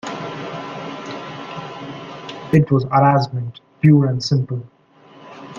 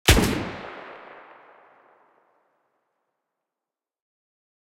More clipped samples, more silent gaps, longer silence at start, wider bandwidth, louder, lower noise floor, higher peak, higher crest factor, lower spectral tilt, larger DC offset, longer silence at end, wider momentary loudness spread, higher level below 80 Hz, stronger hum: neither; neither; about the same, 0.05 s vs 0.05 s; second, 7.4 kHz vs 16 kHz; first, -18 LUFS vs -24 LUFS; second, -47 dBFS vs -89 dBFS; about the same, -2 dBFS vs -2 dBFS; second, 18 dB vs 28 dB; first, -7.5 dB/octave vs -4 dB/octave; neither; second, 0 s vs 3.8 s; second, 18 LU vs 27 LU; second, -54 dBFS vs -36 dBFS; neither